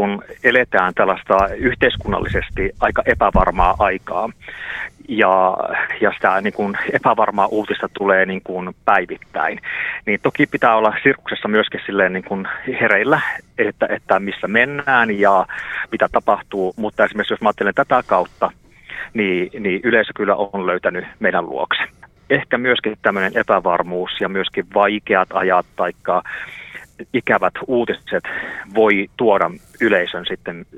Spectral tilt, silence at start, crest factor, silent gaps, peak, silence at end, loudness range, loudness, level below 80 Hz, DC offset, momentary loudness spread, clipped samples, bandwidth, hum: -6.5 dB/octave; 0 s; 18 dB; none; 0 dBFS; 0 s; 2 LU; -18 LUFS; -38 dBFS; under 0.1%; 9 LU; under 0.1%; 12.5 kHz; none